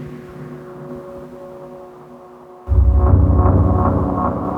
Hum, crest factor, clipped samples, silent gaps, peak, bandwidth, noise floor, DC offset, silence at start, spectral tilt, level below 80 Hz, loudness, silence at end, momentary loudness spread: none; 16 dB; under 0.1%; none; -2 dBFS; 2.7 kHz; -40 dBFS; under 0.1%; 0 s; -11.5 dB/octave; -20 dBFS; -15 LUFS; 0 s; 22 LU